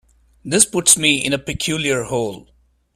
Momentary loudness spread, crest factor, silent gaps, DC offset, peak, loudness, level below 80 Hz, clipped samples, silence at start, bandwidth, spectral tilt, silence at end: 11 LU; 20 dB; none; under 0.1%; 0 dBFS; -16 LUFS; -48 dBFS; under 0.1%; 0.45 s; 16 kHz; -2 dB/octave; 0.55 s